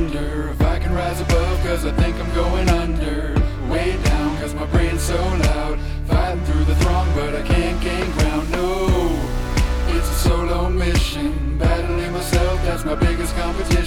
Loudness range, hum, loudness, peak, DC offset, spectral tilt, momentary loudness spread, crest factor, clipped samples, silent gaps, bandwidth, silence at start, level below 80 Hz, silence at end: 1 LU; none; -20 LUFS; -6 dBFS; under 0.1%; -6 dB/octave; 4 LU; 14 dB; under 0.1%; none; 16.5 kHz; 0 s; -22 dBFS; 0 s